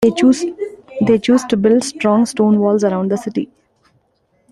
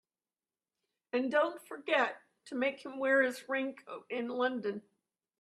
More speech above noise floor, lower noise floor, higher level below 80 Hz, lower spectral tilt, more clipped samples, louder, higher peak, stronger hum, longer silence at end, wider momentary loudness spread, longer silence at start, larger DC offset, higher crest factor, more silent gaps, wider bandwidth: second, 47 dB vs over 57 dB; second, -61 dBFS vs under -90 dBFS; first, -54 dBFS vs -84 dBFS; first, -6 dB/octave vs -4 dB/octave; neither; first, -15 LUFS vs -33 LUFS; first, 0 dBFS vs -16 dBFS; neither; first, 1.05 s vs 0.6 s; second, 11 LU vs 14 LU; second, 0 s vs 1.15 s; neither; second, 14 dB vs 20 dB; neither; second, 12 kHz vs 13.5 kHz